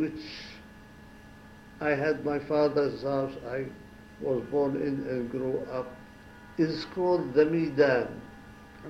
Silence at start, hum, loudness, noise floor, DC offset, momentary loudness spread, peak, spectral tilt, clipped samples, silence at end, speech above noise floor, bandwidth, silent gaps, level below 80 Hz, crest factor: 0 s; none; -29 LUFS; -50 dBFS; under 0.1%; 24 LU; -10 dBFS; -7.5 dB/octave; under 0.1%; 0 s; 22 dB; 11 kHz; none; -58 dBFS; 18 dB